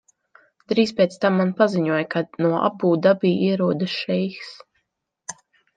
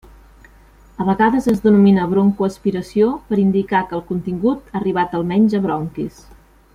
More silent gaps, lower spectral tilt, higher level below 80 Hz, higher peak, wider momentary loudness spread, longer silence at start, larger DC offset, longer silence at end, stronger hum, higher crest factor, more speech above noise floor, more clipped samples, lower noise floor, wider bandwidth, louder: neither; second, -6.5 dB/octave vs -8 dB/octave; second, -68 dBFS vs -46 dBFS; about the same, -4 dBFS vs -2 dBFS; first, 19 LU vs 11 LU; second, 0.7 s vs 1 s; neither; second, 0.45 s vs 0.65 s; neither; about the same, 18 dB vs 16 dB; first, 56 dB vs 30 dB; neither; first, -76 dBFS vs -47 dBFS; second, 9.4 kHz vs 11 kHz; second, -21 LUFS vs -17 LUFS